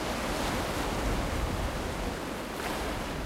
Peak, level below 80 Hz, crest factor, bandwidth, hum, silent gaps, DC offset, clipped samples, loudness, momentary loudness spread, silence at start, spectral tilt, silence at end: -18 dBFS; -38 dBFS; 14 dB; 16 kHz; none; none; under 0.1%; under 0.1%; -33 LUFS; 4 LU; 0 s; -4.5 dB/octave; 0 s